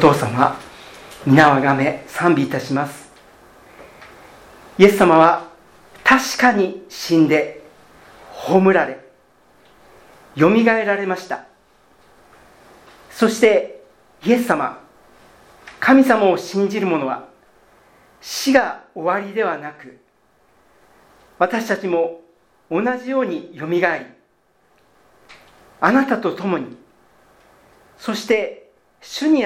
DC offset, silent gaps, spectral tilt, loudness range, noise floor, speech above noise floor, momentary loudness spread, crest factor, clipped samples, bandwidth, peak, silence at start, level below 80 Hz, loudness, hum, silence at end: under 0.1%; none; -5.5 dB/octave; 7 LU; -60 dBFS; 44 dB; 17 LU; 20 dB; under 0.1%; 17 kHz; 0 dBFS; 0 s; -58 dBFS; -17 LUFS; none; 0 s